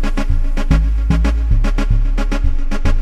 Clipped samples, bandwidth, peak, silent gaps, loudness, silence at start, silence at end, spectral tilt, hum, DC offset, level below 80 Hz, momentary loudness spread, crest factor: under 0.1%; 8.2 kHz; -2 dBFS; none; -18 LUFS; 0 s; 0 s; -7 dB/octave; none; under 0.1%; -14 dBFS; 4 LU; 12 dB